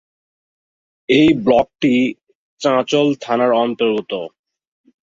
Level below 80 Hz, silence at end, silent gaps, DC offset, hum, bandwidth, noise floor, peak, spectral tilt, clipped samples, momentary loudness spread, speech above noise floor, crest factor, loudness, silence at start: -54 dBFS; 0.85 s; 2.35-2.57 s; under 0.1%; none; 7.8 kHz; under -90 dBFS; -2 dBFS; -5.5 dB/octave; under 0.1%; 12 LU; over 75 dB; 16 dB; -16 LUFS; 1.1 s